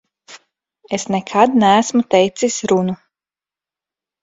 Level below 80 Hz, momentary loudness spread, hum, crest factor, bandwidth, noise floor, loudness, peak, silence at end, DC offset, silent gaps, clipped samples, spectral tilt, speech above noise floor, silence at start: -60 dBFS; 12 LU; none; 18 dB; 8 kHz; under -90 dBFS; -16 LUFS; 0 dBFS; 1.25 s; under 0.1%; none; under 0.1%; -4.5 dB/octave; over 75 dB; 0.3 s